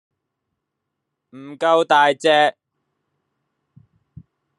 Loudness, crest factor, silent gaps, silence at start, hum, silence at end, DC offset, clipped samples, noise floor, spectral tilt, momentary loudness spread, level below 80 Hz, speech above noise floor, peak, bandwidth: -16 LUFS; 20 dB; none; 1.35 s; none; 2.1 s; under 0.1%; under 0.1%; -79 dBFS; -3.5 dB/octave; 8 LU; -70 dBFS; 63 dB; -2 dBFS; 11 kHz